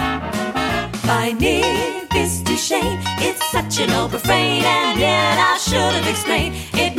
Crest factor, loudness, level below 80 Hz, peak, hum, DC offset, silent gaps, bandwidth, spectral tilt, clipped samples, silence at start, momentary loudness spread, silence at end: 16 dB; -18 LUFS; -36 dBFS; -2 dBFS; none; under 0.1%; none; 16.5 kHz; -3.5 dB/octave; under 0.1%; 0 s; 6 LU; 0 s